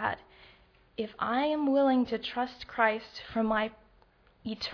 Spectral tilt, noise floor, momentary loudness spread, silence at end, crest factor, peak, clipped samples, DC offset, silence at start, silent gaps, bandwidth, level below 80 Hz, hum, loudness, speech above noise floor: -6 dB/octave; -63 dBFS; 14 LU; 0 s; 20 dB; -10 dBFS; under 0.1%; under 0.1%; 0 s; none; 5.4 kHz; -62 dBFS; none; -30 LUFS; 33 dB